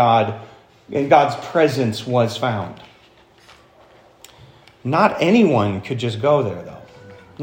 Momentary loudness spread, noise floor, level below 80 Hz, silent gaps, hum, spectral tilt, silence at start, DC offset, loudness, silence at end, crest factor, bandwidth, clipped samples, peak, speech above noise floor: 14 LU; -51 dBFS; -60 dBFS; none; none; -6.5 dB/octave; 0 s; under 0.1%; -18 LUFS; 0 s; 20 dB; 16.5 kHz; under 0.1%; 0 dBFS; 33 dB